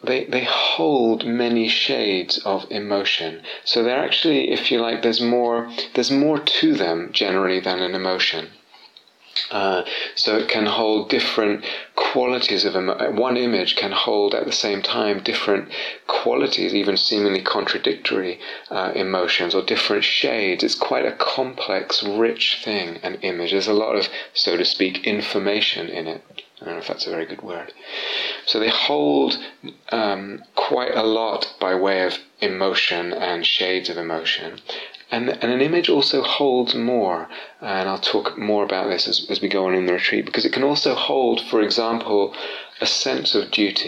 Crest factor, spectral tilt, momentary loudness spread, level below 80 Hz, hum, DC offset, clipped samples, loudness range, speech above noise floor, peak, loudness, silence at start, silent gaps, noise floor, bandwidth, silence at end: 14 dB; -3.5 dB/octave; 9 LU; -72 dBFS; none; under 0.1%; under 0.1%; 2 LU; 29 dB; -6 dBFS; -20 LUFS; 0 s; none; -50 dBFS; 9.8 kHz; 0 s